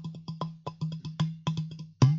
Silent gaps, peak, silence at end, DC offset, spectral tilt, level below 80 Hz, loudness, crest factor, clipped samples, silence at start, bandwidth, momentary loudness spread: none; -8 dBFS; 0 s; under 0.1%; -7 dB/octave; -62 dBFS; -34 LUFS; 22 dB; under 0.1%; 0 s; 7.6 kHz; 8 LU